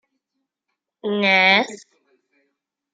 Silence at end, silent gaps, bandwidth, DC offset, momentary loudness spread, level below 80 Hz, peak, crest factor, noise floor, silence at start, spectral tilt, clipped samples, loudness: 1.2 s; none; 9.2 kHz; under 0.1%; 16 LU; -78 dBFS; -2 dBFS; 22 dB; -80 dBFS; 1.05 s; -4 dB/octave; under 0.1%; -16 LUFS